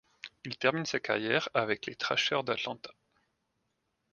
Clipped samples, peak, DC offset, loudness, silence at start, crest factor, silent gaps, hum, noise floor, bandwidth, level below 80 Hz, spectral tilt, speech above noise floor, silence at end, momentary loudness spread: under 0.1%; -10 dBFS; under 0.1%; -31 LUFS; 0.25 s; 24 dB; none; none; -80 dBFS; 10 kHz; -74 dBFS; -3.5 dB/octave; 48 dB; 1.2 s; 16 LU